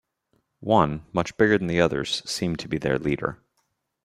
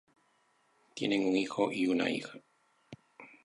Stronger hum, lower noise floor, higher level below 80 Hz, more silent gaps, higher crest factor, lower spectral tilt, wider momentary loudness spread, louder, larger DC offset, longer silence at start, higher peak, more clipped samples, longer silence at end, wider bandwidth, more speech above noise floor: neither; about the same, -74 dBFS vs -72 dBFS; first, -50 dBFS vs -76 dBFS; neither; about the same, 22 dB vs 20 dB; about the same, -5.5 dB/octave vs -5 dB/octave; second, 7 LU vs 19 LU; first, -24 LUFS vs -32 LUFS; neither; second, 0.6 s vs 0.95 s; first, -4 dBFS vs -16 dBFS; neither; first, 0.7 s vs 0.2 s; first, 13.5 kHz vs 11 kHz; first, 50 dB vs 40 dB